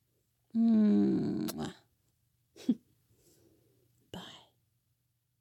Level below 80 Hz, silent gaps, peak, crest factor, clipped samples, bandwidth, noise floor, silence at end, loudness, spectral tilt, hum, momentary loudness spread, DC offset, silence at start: -72 dBFS; none; -18 dBFS; 16 dB; under 0.1%; 17 kHz; -79 dBFS; 1.05 s; -31 LUFS; -7.5 dB/octave; none; 22 LU; under 0.1%; 0.55 s